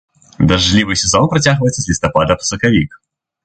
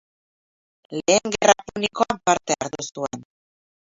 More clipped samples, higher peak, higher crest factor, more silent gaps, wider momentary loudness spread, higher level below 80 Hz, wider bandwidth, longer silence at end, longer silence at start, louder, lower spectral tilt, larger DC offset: neither; about the same, 0 dBFS vs 0 dBFS; second, 14 dB vs 24 dB; neither; second, 5 LU vs 13 LU; first, -32 dBFS vs -58 dBFS; first, 9.2 kHz vs 8 kHz; second, 0.5 s vs 0.7 s; second, 0.4 s vs 0.9 s; first, -13 LUFS vs -22 LUFS; first, -4 dB/octave vs -2.5 dB/octave; neither